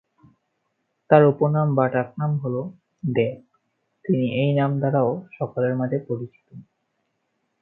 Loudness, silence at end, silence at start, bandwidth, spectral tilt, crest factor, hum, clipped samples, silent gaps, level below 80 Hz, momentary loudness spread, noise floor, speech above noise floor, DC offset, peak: -22 LUFS; 1 s; 1.1 s; 4.1 kHz; -12 dB/octave; 22 dB; none; under 0.1%; none; -66 dBFS; 14 LU; -74 dBFS; 53 dB; under 0.1%; 0 dBFS